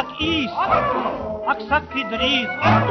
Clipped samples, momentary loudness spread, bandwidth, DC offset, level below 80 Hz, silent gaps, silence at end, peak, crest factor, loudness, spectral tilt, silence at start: under 0.1%; 7 LU; 6.4 kHz; under 0.1%; -44 dBFS; none; 0 s; -4 dBFS; 18 dB; -20 LUFS; -3 dB/octave; 0 s